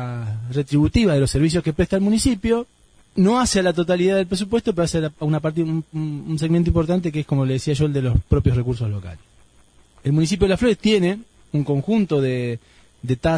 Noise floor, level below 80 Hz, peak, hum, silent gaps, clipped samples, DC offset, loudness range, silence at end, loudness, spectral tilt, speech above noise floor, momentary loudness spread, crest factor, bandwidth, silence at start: -53 dBFS; -36 dBFS; -2 dBFS; none; none; under 0.1%; under 0.1%; 3 LU; 0 s; -20 LUFS; -6.5 dB/octave; 34 dB; 10 LU; 16 dB; 10.5 kHz; 0 s